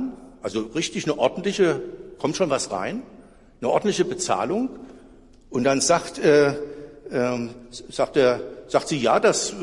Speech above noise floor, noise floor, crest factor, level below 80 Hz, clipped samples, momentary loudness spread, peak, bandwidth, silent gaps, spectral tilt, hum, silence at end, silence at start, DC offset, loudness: 27 dB; -49 dBFS; 18 dB; -54 dBFS; under 0.1%; 15 LU; -6 dBFS; 11.5 kHz; none; -4 dB/octave; none; 0 s; 0 s; under 0.1%; -23 LUFS